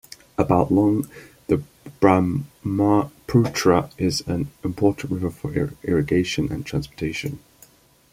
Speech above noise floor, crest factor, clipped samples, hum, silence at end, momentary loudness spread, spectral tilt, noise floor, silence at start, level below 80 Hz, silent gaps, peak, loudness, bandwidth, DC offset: 32 dB; 20 dB; under 0.1%; none; 0.75 s; 10 LU; -6.5 dB/octave; -53 dBFS; 0.4 s; -46 dBFS; none; -2 dBFS; -22 LUFS; 16 kHz; under 0.1%